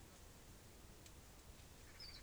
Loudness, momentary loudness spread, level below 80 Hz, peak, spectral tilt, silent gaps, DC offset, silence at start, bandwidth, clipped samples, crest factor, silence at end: -60 LUFS; 5 LU; -64 dBFS; -42 dBFS; -3 dB/octave; none; under 0.1%; 0 s; over 20 kHz; under 0.1%; 16 dB; 0 s